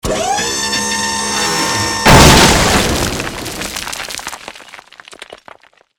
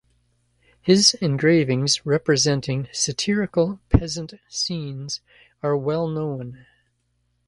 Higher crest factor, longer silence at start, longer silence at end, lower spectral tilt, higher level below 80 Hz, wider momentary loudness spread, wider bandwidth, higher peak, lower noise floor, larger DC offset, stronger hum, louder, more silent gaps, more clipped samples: second, 14 dB vs 22 dB; second, 0.05 s vs 0.85 s; second, 0.6 s vs 0.9 s; about the same, -3 dB/octave vs -4 dB/octave; first, -26 dBFS vs -38 dBFS; first, 17 LU vs 14 LU; first, over 20 kHz vs 11.5 kHz; about the same, 0 dBFS vs 0 dBFS; second, -42 dBFS vs -70 dBFS; neither; second, none vs 60 Hz at -50 dBFS; first, -12 LUFS vs -21 LUFS; neither; first, 0.9% vs under 0.1%